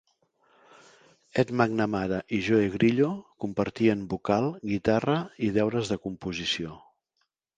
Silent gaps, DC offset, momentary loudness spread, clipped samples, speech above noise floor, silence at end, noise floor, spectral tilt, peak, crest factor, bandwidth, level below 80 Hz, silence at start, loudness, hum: none; under 0.1%; 8 LU; under 0.1%; 51 dB; 0.8 s; -77 dBFS; -6.5 dB/octave; -6 dBFS; 22 dB; 9.4 kHz; -56 dBFS; 1.35 s; -27 LUFS; none